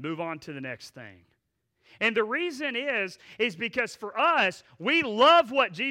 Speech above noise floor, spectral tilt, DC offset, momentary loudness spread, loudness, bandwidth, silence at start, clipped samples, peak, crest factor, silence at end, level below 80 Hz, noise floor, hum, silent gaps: 50 dB; -4 dB/octave; under 0.1%; 17 LU; -25 LUFS; 15 kHz; 0 s; under 0.1%; -10 dBFS; 18 dB; 0 s; -70 dBFS; -77 dBFS; none; none